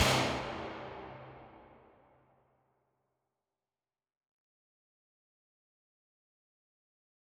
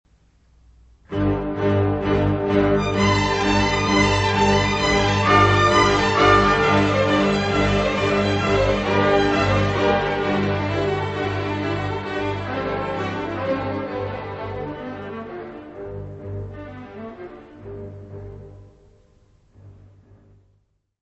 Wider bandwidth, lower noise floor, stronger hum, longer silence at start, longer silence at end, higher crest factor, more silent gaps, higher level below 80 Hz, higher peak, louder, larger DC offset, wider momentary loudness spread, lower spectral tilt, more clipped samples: first, over 20 kHz vs 8.4 kHz; first, under -90 dBFS vs -65 dBFS; neither; second, 0 s vs 1.1 s; first, 5.65 s vs 1.3 s; first, 28 dB vs 18 dB; neither; second, -60 dBFS vs -38 dBFS; second, -14 dBFS vs -2 dBFS; second, -35 LUFS vs -20 LUFS; neither; first, 25 LU vs 20 LU; second, -3.5 dB/octave vs -5.5 dB/octave; neither